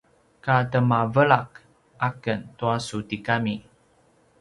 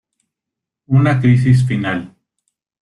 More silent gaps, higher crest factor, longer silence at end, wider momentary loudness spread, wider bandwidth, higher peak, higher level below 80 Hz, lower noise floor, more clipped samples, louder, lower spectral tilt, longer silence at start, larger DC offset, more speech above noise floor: neither; first, 22 dB vs 14 dB; about the same, 0.8 s vs 0.75 s; about the same, 11 LU vs 9 LU; about the same, 11.5 kHz vs 10.5 kHz; about the same, -2 dBFS vs -2 dBFS; second, -58 dBFS vs -48 dBFS; second, -61 dBFS vs -83 dBFS; neither; second, -24 LUFS vs -15 LUFS; second, -6.5 dB/octave vs -8 dB/octave; second, 0.45 s vs 0.9 s; neither; second, 38 dB vs 70 dB